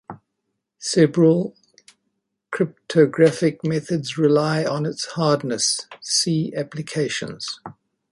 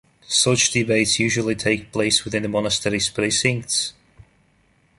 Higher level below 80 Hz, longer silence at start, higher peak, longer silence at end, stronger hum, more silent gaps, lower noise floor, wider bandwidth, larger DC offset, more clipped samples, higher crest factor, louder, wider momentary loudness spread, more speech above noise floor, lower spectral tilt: second, -64 dBFS vs -50 dBFS; second, 0.1 s vs 0.3 s; about the same, -2 dBFS vs -4 dBFS; second, 0.4 s vs 1.1 s; neither; neither; first, -77 dBFS vs -60 dBFS; about the same, 11.5 kHz vs 11.5 kHz; neither; neither; about the same, 18 dB vs 18 dB; about the same, -21 LUFS vs -20 LUFS; first, 13 LU vs 5 LU; first, 57 dB vs 40 dB; first, -4.5 dB/octave vs -3 dB/octave